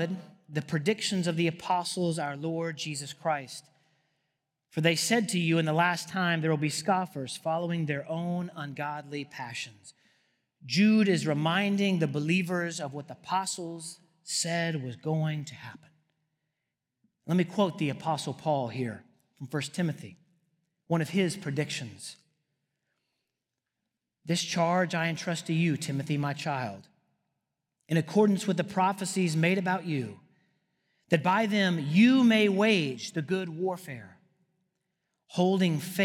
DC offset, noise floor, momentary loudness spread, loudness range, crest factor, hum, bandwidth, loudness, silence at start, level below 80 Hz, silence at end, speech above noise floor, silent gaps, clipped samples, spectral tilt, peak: under 0.1%; -86 dBFS; 14 LU; 8 LU; 22 dB; none; 16 kHz; -29 LUFS; 0 s; -80 dBFS; 0 s; 58 dB; none; under 0.1%; -5 dB/octave; -6 dBFS